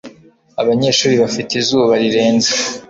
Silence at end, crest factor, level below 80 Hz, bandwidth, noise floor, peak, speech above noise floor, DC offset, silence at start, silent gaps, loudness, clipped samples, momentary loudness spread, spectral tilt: 0.05 s; 12 dB; -54 dBFS; 8 kHz; -42 dBFS; -2 dBFS; 28 dB; under 0.1%; 0.05 s; none; -14 LUFS; under 0.1%; 4 LU; -3.5 dB/octave